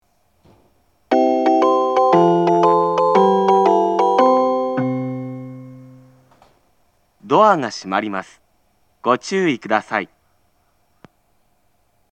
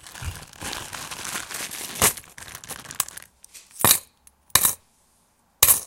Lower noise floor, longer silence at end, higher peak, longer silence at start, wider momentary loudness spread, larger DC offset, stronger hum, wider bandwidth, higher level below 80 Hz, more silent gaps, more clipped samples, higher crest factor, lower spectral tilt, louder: about the same, -64 dBFS vs -63 dBFS; first, 2.05 s vs 0 s; about the same, 0 dBFS vs 0 dBFS; first, 1.1 s vs 0.05 s; second, 13 LU vs 18 LU; neither; neither; second, 8.8 kHz vs 17 kHz; second, -68 dBFS vs -48 dBFS; neither; neither; second, 18 dB vs 26 dB; first, -6 dB/octave vs -0.5 dB/octave; first, -16 LUFS vs -22 LUFS